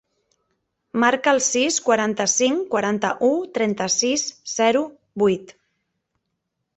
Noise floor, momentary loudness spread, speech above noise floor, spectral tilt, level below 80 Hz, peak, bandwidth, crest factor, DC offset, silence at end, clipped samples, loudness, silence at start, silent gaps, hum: -77 dBFS; 6 LU; 57 dB; -2.5 dB/octave; -64 dBFS; -4 dBFS; 8.4 kHz; 20 dB; under 0.1%; 1.25 s; under 0.1%; -20 LUFS; 0.95 s; none; none